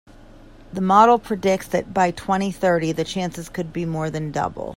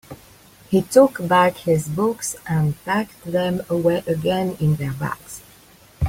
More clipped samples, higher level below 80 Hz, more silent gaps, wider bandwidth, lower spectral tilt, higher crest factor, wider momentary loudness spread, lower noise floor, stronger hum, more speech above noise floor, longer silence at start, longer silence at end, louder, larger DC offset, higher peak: neither; about the same, -48 dBFS vs -46 dBFS; neither; about the same, 16 kHz vs 16.5 kHz; about the same, -6 dB/octave vs -6 dB/octave; about the same, 20 dB vs 18 dB; about the same, 12 LU vs 11 LU; second, -44 dBFS vs -49 dBFS; neither; second, 24 dB vs 30 dB; about the same, 0.2 s vs 0.1 s; about the same, 0 s vs 0 s; about the same, -21 LUFS vs -20 LUFS; neither; about the same, 0 dBFS vs -2 dBFS